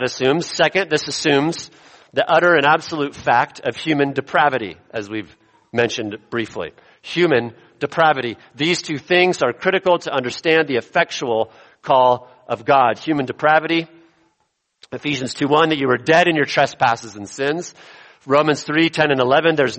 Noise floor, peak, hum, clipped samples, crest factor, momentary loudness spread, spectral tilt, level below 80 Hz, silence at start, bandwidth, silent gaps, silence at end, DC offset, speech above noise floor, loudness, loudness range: -69 dBFS; 0 dBFS; none; under 0.1%; 18 dB; 13 LU; -4.5 dB/octave; -60 dBFS; 0 s; 8.8 kHz; none; 0 s; under 0.1%; 51 dB; -18 LUFS; 4 LU